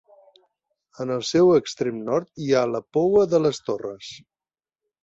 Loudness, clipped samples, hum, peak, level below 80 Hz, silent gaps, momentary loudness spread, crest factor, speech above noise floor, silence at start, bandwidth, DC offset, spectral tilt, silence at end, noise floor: -22 LUFS; under 0.1%; none; -6 dBFS; -62 dBFS; none; 14 LU; 16 dB; over 68 dB; 1 s; 8 kHz; under 0.1%; -6 dB/octave; 0.85 s; under -90 dBFS